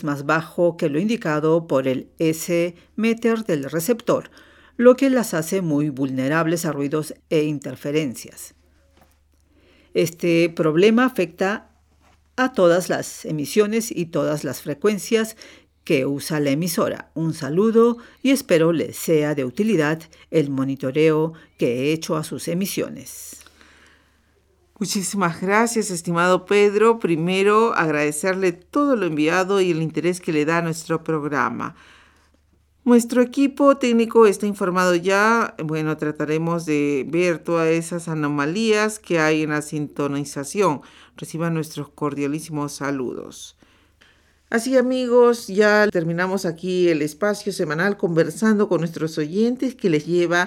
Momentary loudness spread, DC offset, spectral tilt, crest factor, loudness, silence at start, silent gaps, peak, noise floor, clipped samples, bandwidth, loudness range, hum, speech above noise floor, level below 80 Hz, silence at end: 10 LU; under 0.1%; -5.5 dB/octave; 20 dB; -20 LUFS; 0 s; none; -2 dBFS; -60 dBFS; under 0.1%; 18.5 kHz; 7 LU; none; 40 dB; -62 dBFS; 0 s